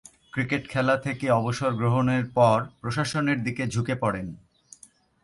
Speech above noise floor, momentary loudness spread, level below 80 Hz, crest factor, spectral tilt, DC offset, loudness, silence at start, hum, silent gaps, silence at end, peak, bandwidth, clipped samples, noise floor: 31 dB; 9 LU; -56 dBFS; 18 dB; -6.5 dB/octave; under 0.1%; -25 LUFS; 0.35 s; none; none; 0.9 s; -8 dBFS; 11.5 kHz; under 0.1%; -56 dBFS